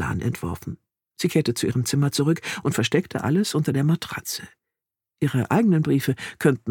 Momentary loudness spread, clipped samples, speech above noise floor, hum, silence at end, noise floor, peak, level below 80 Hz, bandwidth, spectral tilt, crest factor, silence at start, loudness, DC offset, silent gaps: 10 LU; under 0.1%; 65 dB; none; 0 s; -87 dBFS; -4 dBFS; -52 dBFS; 19 kHz; -5.5 dB/octave; 20 dB; 0 s; -23 LUFS; under 0.1%; none